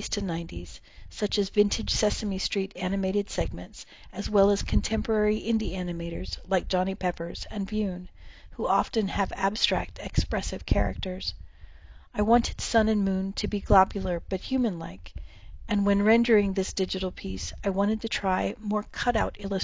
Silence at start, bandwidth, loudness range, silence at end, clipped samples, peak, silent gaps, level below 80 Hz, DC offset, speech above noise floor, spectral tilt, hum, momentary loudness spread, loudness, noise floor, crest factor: 0 s; 7.8 kHz; 3 LU; 0 s; under 0.1%; -6 dBFS; none; -38 dBFS; 0.1%; 21 dB; -5 dB/octave; none; 14 LU; -27 LUFS; -48 dBFS; 22 dB